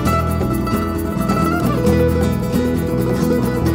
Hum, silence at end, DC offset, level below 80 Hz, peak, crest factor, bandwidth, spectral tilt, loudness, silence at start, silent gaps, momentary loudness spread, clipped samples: none; 0 s; under 0.1%; -28 dBFS; -2 dBFS; 14 dB; 16.5 kHz; -7 dB/octave; -18 LUFS; 0 s; none; 4 LU; under 0.1%